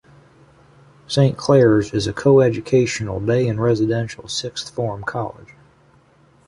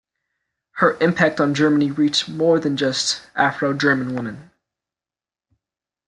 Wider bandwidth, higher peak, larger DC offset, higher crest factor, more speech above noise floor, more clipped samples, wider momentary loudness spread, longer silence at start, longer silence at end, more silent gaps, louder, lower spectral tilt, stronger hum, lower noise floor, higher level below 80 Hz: about the same, 11.5 kHz vs 11 kHz; about the same, -2 dBFS vs -2 dBFS; neither; about the same, 16 dB vs 18 dB; second, 36 dB vs over 71 dB; neither; first, 11 LU vs 6 LU; first, 1.1 s vs 0.75 s; second, 1.05 s vs 1.65 s; neither; about the same, -19 LUFS vs -19 LUFS; first, -6 dB/octave vs -4.5 dB/octave; neither; second, -54 dBFS vs under -90 dBFS; first, -48 dBFS vs -62 dBFS